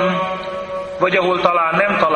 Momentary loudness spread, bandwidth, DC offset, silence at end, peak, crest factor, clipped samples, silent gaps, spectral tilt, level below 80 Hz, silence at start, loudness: 10 LU; 9.2 kHz; under 0.1%; 0 s; 0 dBFS; 16 dB; under 0.1%; none; -6 dB/octave; -52 dBFS; 0 s; -17 LUFS